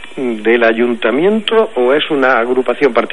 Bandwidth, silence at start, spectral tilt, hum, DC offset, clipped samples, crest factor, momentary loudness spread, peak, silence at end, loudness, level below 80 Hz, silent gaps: 10.5 kHz; 0 s; -5.5 dB/octave; none; 3%; under 0.1%; 12 dB; 3 LU; 0 dBFS; 0.05 s; -13 LUFS; -56 dBFS; none